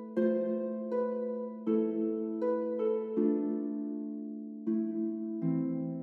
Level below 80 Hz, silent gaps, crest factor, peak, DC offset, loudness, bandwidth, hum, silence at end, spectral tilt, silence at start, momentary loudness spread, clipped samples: under -90 dBFS; none; 14 dB; -18 dBFS; under 0.1%; -33 LUFS; 3.3 kHz; none; 0 s; -11.5 dB/octave; 0 s; 7 LU; under 0.1%